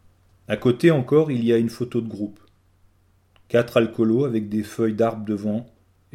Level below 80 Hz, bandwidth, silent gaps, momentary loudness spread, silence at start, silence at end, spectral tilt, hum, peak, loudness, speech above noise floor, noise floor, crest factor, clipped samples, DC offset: -60 dBFS; 14 kHz; none; 10 LU; 0.5 s; 0.5 s; -7.5 dB/octave; none; -4 dBFS; -22 LUFS; 39 dB; -60 dBFS; 18 dB; under 0.1%; under 0.1%